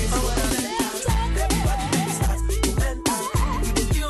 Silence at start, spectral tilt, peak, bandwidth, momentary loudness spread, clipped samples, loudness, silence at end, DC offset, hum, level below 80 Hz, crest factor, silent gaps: 0 s; -4.5 dB/octave; -6 dBFS; 12.5 kHz; 2 LU; under 0.1%; -23 LUFS; 0 s; under 0.1%; none; -26 dBFS; 16 dB; none